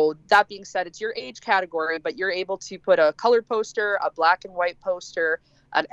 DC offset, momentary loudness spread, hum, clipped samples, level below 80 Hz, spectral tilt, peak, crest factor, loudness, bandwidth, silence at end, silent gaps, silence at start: under 0.1%; 11 LU; none; under 0.1%; -66 dBFS; -3 dB/octave; -6 dBFS; 18 dB; -23 LUFS; 10 kHz; 0.05 s; none; 0 s